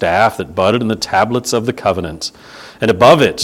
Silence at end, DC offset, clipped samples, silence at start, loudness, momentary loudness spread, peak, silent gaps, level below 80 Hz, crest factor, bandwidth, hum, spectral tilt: 0 s; under 0.1%; 0.3%; 0 s; -14 LUFS; 12 LU; 0 dBFS; none; -44 dBFS; 14 dB; 17 kHz; none; -4.5 dB/octave